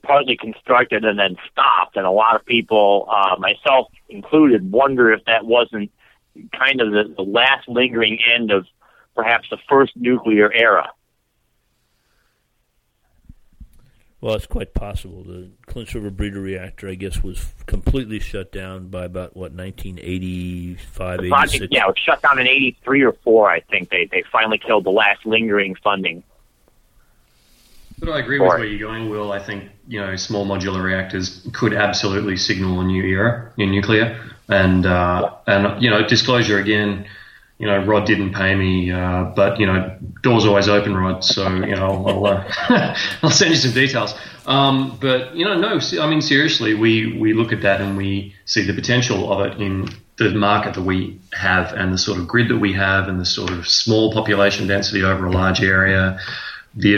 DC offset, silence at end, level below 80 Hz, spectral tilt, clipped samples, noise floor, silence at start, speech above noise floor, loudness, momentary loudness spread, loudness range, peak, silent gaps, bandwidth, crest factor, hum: under 0.1%; 0 s; -38 dBFS; -5 dB/octave; under 0.1%; -66 dBFS; 0.05 s; 49 dB; -17 LUFS; 15 LU; 12 LU; -2 dBFS; none; 15.5 kHz; 16 dB; none